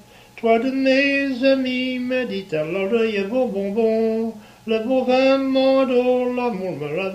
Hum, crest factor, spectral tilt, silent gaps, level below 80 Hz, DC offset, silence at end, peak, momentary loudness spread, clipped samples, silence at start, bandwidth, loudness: none; 16 dB; -6 dB/octave; none; -58 dBFS; under 0.1%; 0 s; -4 dBFS; 8 LU; under 0.1%; 0.35 s; 10.5 kHz; -20 LUFS